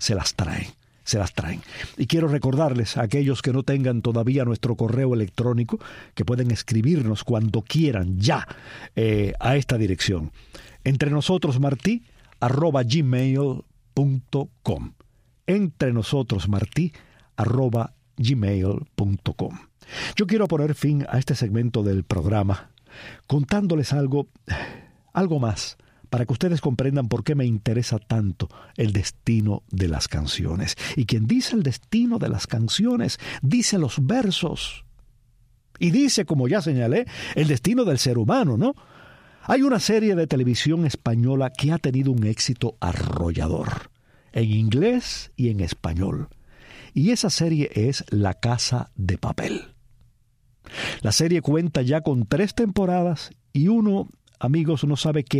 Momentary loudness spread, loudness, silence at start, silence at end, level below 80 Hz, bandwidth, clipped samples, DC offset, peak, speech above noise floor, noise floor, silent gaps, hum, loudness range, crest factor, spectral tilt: 10 LU; -23 LUFS; 0 s; 0 s; -44 dBFS; 15 kHz; under 0.1%; under 0.1%; -8 dBFS; 38 dB; -61 dBFS; none; none; 3 LU; 16 dB; -6 dB/octave